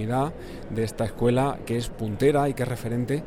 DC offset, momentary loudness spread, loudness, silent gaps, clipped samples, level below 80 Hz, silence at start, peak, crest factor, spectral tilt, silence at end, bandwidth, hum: under 0.1%; 9 LU; -26 LUFS; none; under 0.1%; -42 dBFS; 0 s; -8 dBFS; 18 dB; -7 dB/octave; 0 s; 16.5 kHz; none